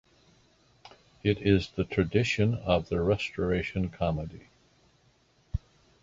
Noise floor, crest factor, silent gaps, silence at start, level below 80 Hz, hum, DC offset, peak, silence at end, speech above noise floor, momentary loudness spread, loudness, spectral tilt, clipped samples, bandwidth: -65 dBFS; 22 dB; none; 0.85 s; -46 dBFS; none; under 0.1%; -8 dBFS; 0.45 s; 38 dB; 13 LU; -29 LUFS; -7 dB/octave; under 0.1%; 7.8 kHz